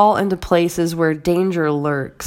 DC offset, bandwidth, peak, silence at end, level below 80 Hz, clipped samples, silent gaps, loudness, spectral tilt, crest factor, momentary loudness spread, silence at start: under 0.1%; 16.5 kHz; 0 dBFS; 0 s; -44 dBFS; under 0.1%; none; -18 LUFS; -6 dB/octave; 16 dB; 3 LU; 0 s